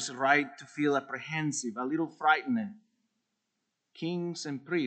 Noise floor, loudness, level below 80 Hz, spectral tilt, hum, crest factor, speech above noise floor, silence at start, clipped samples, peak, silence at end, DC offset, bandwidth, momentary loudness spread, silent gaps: -83 dBFS; -31 LUFS; -84 dBFS; -4.5 dB/octave; none; 22 dB; 52 dB; 0 s; under 0.1%; -10 dBFS; 0 s; under 0.1%; 9 kHz; 11 LU; none